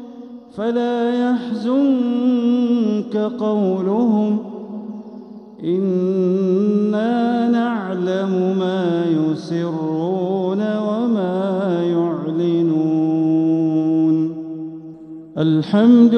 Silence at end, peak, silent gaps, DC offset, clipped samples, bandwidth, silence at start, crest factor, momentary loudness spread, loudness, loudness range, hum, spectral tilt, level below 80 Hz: 0 s; -2 dBFS; none; under 0.1%; under 0.1%; 6.4 kHz; 0 s; 16 dB; 14 LU; -18 LUFS; 2 LU; none; -8.5 dB/octave; -70 dBFS